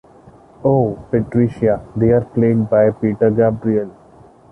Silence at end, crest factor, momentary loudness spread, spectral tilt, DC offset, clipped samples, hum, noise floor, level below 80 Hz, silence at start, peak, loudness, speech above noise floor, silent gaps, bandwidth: 0.6 s; 14 dB; 6 LU; -11 dB/octave; under 0.1%; under 0.1%; none; -45 dBFS; -44 dBFS; 0.6 s; -2 dBFS; -16 LUFS; 30 dB; none; 3.2 kHz